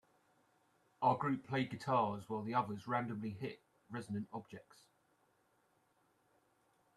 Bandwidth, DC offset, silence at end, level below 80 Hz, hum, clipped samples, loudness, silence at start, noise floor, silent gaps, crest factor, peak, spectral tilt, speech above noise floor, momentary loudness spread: 13 kHz; under 0.1%; 2.35 s; -80 dBFS; none; under 0.1%; -39 LUFS; 1 s; -76 dBFS; none; 22 dB; -20 dBFS; -7 dB/octave; 37 dB; 14 LU